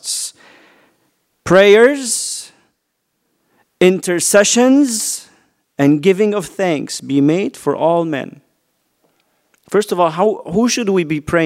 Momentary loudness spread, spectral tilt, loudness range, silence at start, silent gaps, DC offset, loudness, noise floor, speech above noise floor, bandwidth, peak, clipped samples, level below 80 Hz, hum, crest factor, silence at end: 12 LU; -4 dB/octave; 5 LU; 0.05 s; none; under 0.1%; -14 LUFS; -70 dBFS; 57 dB; 16 kHz; 0 dBFS; under 0.1%; -52 dBFS; none; 16 dB; 0 s